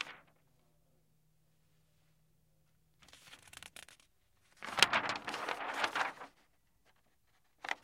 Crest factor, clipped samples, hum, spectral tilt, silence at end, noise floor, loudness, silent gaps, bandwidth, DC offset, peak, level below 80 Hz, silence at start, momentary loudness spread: 40 dB; under 0.1%; none; -0.5 dB/octave; 0.1 s; -76 dBFS; -34 LUFS; none; 16.5 kHz; under 0.1%; -2 dBFS; -76 dBFS; 0 s; 25 LU